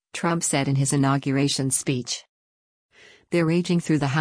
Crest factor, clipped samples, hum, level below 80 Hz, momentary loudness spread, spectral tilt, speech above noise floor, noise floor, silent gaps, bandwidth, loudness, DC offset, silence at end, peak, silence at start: 14 dB; under 0.1%; none; -60 dBFS; 6 LU; -4.5 dB/octave; over 68 dB; under -90 dBFS; 2.29-2.89 s; 10.5 kHz; -23 LUFS; under 0.1%; 0 s; -10 dBFS; 0.15 s